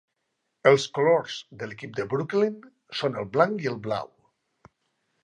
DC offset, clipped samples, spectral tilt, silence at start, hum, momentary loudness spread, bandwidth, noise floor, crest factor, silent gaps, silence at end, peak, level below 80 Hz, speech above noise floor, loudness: under 0.1%; under 0.1%; -5.5 dB/octave; 0.65 s; none; 16 LU; 9.8 kHz; -78 dBFS; 22 dB; none; 1.15 s; -4 dBFS; -68 dBFS; 53 dB; -25 LUFS